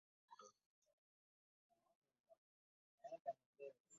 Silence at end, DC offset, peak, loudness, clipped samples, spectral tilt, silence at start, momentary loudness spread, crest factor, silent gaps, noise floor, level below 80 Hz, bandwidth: 0 s; under 0.1%; -36 dBFS; -57 LUFS; under 0.1%; -3 dB/octave; 0.3 s; 14 LU; 26 dB; 0.66-0.82 s, 0.93-1.70 s, 1.95-2.02 s, 2.20-2.24 s, 2.38-2.98 s, 3.20-3.25 s, 3.46-3.53 s, 3.80-3.84 s; under -90 dBFS; under -90 dBFS; 7 kHz